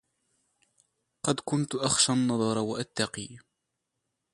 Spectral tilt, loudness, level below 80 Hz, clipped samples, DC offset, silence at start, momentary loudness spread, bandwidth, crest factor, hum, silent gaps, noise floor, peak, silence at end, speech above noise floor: -3.5 dB/octave; -28 LUFS; -64 dBFS; under 0.1%; under 0.1%; 1.25 s; 10 LU; 11.5 kHz; 22 dB; none; none; -83 dBFS; -10 dBFS; 0.95 s; 55 dB